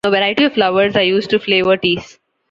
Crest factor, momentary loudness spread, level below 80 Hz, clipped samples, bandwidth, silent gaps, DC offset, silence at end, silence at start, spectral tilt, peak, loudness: 14 dB; 3 LU; -52 dBFS; under 0.1%; 7.8 kHz; none; under 0.1%; 0.45 s; 0.05 s; -5.5 dB/octave; -2 dBFS; -14 LUFS